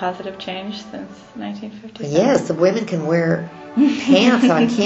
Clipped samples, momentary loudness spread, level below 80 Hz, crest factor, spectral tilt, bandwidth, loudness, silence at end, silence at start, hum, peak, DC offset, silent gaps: under 0.1%; 18 LU; -60 dBFS; 16 dB; -6 dB/octave; 8.2 kHz; -17 LUFS; 0 s; 0 s; none; -2 dBFS; under 0.1%; none